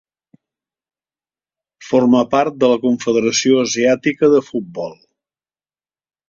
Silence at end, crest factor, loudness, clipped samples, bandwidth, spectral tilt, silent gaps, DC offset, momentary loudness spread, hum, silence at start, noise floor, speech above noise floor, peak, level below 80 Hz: 1.35 s; 16 dB; -15 LUFS; under 0.1%; 7.6 kHz; -4 dB/octave; none; under 0.1%; 12 LU; none; 1.8 s; under -90 dBFS; over 75 dB; -2 dBFS; -58 dBFS